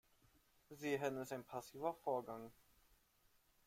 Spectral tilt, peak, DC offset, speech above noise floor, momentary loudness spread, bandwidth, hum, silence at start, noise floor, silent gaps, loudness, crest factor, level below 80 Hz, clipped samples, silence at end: -5 dB/octave; -28 dBFS; under 0.1%; 31 dB; 12 LU; 16.5 kHz; none; 0.7 s; -76 dBFS; none; -46 LUFS; 20 dB; -80 dBFS; under 0.1%; 1.15 s